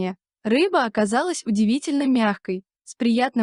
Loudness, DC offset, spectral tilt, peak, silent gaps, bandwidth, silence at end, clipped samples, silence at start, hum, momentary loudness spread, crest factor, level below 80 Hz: -22 LUFS; under 0.1%; -5 dB/octave; -8 dBFS; none; 11 kHz; 0 s; under 0.1%; 0 s; none; 11 LU; 14 dB; -66 dBFS